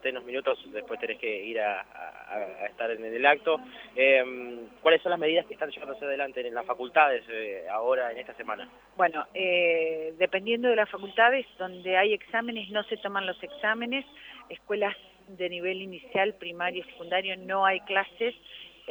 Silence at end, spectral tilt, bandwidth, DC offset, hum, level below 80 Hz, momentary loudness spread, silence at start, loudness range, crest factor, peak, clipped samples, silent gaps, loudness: 0 s; -5.5 dB/octave; 19.5 kHz; under 0.1%; none; -70 dBFS; 14 LU; 0.05 s; 6 LU; 22 dB; -6 dBFS; under 0.1%; none; -28 LUFS